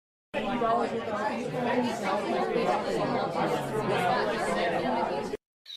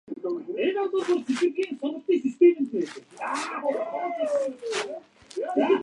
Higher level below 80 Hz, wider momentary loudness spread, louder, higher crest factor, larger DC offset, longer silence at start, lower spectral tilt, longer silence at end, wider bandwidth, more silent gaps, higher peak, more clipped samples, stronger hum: first, -58 dBFS vs -78 dBFS; second, 5 LU vs 13 LU; about the same, -29 LUFS vs -27 LUFS; about the same, 14 dB vs 18 dB; neither; first, 0.35 s vs 0.1 s; first, -5.5 dB/octave vs -4 dB/octave; about the same, 0 s vs 0 s; first, 15 kHz vs 11 kHz; first, 5.46-5.65 s vs none; second, -14 dBFS vs -8 dBFS; neither; neither